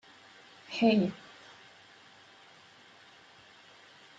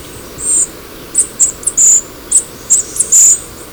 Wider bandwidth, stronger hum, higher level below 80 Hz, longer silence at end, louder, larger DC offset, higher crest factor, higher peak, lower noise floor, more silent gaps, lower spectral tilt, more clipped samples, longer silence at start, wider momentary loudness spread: second, 7.8 kHz vs over 20 kHz; neither; second, -78 dBFS vs -42 dBFS; first, 3.05 s vs 0 s; second, -29 LUFS vs -9 LUFS; second, under 0.1% vs 0.1%; first, 24 dB vs 12 dB; second, -12 dBFS vs 0 dBFS; first, -57 dBFS vs -30 dBFS; neither; first, -6.5 dB/octave vs 0 dB/octave; neither; first, 0.7 s vs 0 s; first, 28 LU vs 10 LU